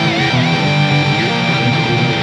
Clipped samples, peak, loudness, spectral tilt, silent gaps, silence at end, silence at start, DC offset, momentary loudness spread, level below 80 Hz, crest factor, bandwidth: under 0.1%; -2 dBFS; -13 LUFS; -5.5 dB/octave; none; 0 s; 0 s; under 0.1%; 1 LU; -46 dBFS; 12 dB; 10 kHz